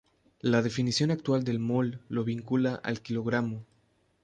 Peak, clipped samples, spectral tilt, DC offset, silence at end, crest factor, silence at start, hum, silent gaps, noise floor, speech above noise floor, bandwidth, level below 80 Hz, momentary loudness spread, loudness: -12 dBFS; under 0.1%; -6 dB/octave; under 0.1%; 0.6 s; 18 dB; 0.45 s; none; none; -69 dBFS; 40 dB; 9.6 kHz; -64 dBFS; 7 LU; -29 LUFS